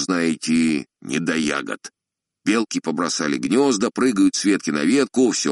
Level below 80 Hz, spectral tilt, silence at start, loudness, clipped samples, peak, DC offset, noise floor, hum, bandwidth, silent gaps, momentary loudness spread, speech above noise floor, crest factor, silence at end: -62 dBFS; -3.5 dB/octave; 0 s; -20 LUFS; under 0.1%; -4 dBFS; under 0.1%; -64 dBFS; none; 11.5 kHz; none; 9 LU; 44 dB; 16 dB; 0 s